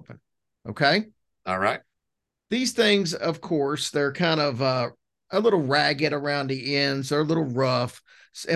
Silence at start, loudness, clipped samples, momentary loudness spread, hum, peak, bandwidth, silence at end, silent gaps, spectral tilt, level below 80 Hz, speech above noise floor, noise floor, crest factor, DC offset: 0.1 s; -24 LUFS; under 0.1%; 12 LU; none; -6 dBFS; 12.5 kHz; 0 s; none; -4.5 dB/octave; -64 dBFS; 59 dB; -83 dBFS; 20 dB; under 0.1%